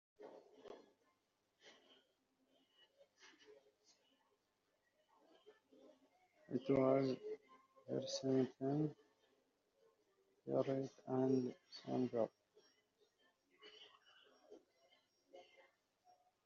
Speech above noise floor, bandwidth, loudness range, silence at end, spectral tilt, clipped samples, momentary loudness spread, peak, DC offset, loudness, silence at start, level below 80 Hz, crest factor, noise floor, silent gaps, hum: 44 dB; 7.2 kHz; 8 LU; 1.05 s; -6.5 dB/octave; under 0.1%; 25 LU; -24 dBFS; under 0.1%; -41 LUFS; 0.2 s; -86 dBFS; 22 dB; -85 dBFS; none; none